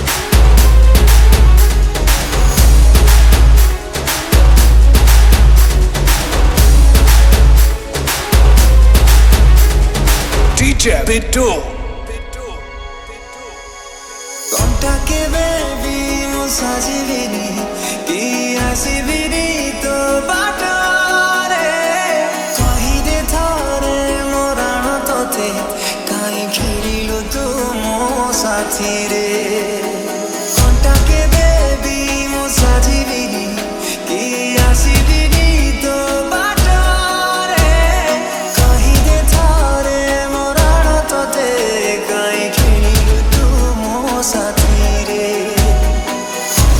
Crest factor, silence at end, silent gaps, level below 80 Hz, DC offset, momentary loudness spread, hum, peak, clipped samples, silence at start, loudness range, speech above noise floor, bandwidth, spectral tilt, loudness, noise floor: 12 dB; 0 s; none; -12 dBFS; under 0.1%; 9 LU; none; 0 dBFS; under 0.1%; 0 s; 7 LU; 16 dB; 18 kHz; -4 dB/octave; -13 LUFS; -31 dBFS